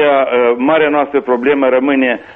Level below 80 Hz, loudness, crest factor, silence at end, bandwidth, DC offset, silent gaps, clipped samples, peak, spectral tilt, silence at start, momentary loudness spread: -54 dBFS; -12 LUFS; 10 dB; 0.05 s; 3.9 kHz; under 0.1%; none; under 0.1%; -2 dBFS; -7.5 dB/octave; 0 s; 3 LU